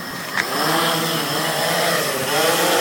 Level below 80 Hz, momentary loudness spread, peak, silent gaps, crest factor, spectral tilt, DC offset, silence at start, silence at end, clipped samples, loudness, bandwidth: -62 dBFS; 4 LU; 0 dBFS; none; 18 dB; -2.5 dB/octave; under 0.1%; 0 s; 0 s; under 0.1%; -19 LUFS; 17 kHz